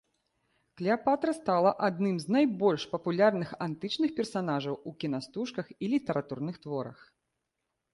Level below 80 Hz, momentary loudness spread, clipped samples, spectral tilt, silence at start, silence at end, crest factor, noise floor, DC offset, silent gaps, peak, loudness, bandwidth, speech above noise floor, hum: -72 dBFS; 11 LU; under 0.1%; -6.5 dB/octave; 0.75 s; 1 s; 20 dB; -84 dBFS; under 0.1%; none; -12 dBFS; -30 LUFS; 11.5 kHz; 54 dB; none